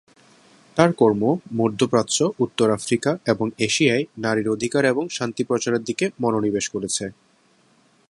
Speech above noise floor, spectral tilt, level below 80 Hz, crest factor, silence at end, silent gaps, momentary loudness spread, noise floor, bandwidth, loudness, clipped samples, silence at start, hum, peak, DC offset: 38 dB; -4.5 dB/octave; -60 dBFS; 22 dB; 1 s; none; 7 LU; -59 dBFS; 11.5 kHz; -21 LUFS; under 0.1%; 0.75 s; none; 0 dBFS; under 0.1%